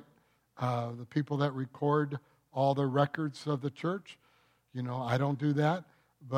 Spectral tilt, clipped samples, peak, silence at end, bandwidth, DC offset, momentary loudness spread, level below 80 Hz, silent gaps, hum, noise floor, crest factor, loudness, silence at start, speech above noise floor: -8 dB/octave; under 0.1%; -14 dBFS; 0 s; 9.8 kHz; under 0.1%; 11 LU; -78 dBFS; none; none; -69 dBFS; 18 dB; -33 LUFS; 0.55 s; 37 dB